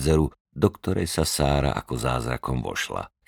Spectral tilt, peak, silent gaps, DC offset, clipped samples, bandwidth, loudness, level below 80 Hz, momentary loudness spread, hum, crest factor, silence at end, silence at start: -5 dB/octave; -6 dBFS; 0.40-0.45 s; under 0.1%; under 0.1%; 19 kHz; -25 LUFS; -36 dBFS; 6 LU; none; 20 dB; 0.2 s; 0 s